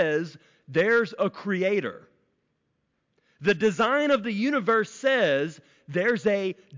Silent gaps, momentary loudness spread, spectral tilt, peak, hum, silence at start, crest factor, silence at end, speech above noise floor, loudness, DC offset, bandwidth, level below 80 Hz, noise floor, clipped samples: none; 7 LU; -5.5 dB/octave; -12 dBFS; none; 0 s; 14 dB; 0 s; 50 dB; -25 LUFS; under 0.1%; 7.6 kHz; -70 dBFS; -75 dBFS; under 0.1%